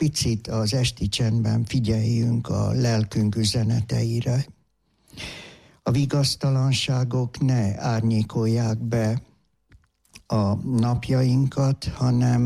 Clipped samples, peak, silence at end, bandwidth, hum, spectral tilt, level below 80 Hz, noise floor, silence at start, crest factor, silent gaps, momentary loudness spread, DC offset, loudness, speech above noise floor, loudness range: under 0.1%; -12 dBFS; 0 s; 13 kHz; none; -6 dB/octave; -46 dBFS; -66 dBFS; 0 s; 10 dB; none; 5 LU; under 0.1%; -23 LUFS; 44 dB; 2 LU